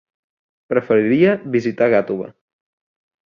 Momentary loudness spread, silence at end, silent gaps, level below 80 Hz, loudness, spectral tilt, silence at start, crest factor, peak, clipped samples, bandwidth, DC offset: 11 LU; 0.95 s; none; -60 dBFS; -17 LUFS; -8 dB/octave; 0.7 s; 18 dB; -2 dBFS; under 0.1%; 7 kHz; under 0.1%